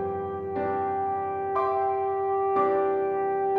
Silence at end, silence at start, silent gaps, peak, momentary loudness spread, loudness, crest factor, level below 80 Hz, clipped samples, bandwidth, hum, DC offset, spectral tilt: 0 s; 0 s; none; -12 dBFS; 6 LU; -27 LUFS; 14 dB; -66 dBFS; under 0.1%; 4.3 kHz; none; under 0.1%; -9 dB/octave